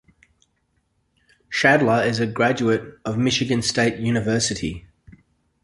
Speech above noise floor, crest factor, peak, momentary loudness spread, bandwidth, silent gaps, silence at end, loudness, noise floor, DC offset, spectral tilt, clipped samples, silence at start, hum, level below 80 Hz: 48 dB; 20 dB; -2 dBFS; 11 LU; 11.5 kHz; none; 0.85 s; -20 LUFS; -69 dBFS; under 0.1%; -4.5 dB/octave; under 0.1%; 1.5 s; none; -50 dBFS